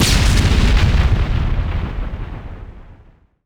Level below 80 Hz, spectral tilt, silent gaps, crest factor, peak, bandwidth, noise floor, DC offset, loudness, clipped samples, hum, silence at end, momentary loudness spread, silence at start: -18 dBFS; -4.5 dB/octave; none; 14 dB; -2 dBFS; 17 kHz; -48 dBFS; under 0.1%; -17 LUFS; under 0.1%; none; 0.5 s; 18 LU; 0 s